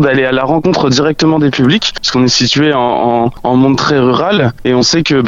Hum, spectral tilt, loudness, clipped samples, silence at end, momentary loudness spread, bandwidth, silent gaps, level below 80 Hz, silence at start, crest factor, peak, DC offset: none; -5 dB/octave; -10 LUFS; under 0.1%; 0 s; 3 LU; 7.8 kHz; none; -38 dBFS; 0 s; 10 dB; 0 dBFS; under 0.1%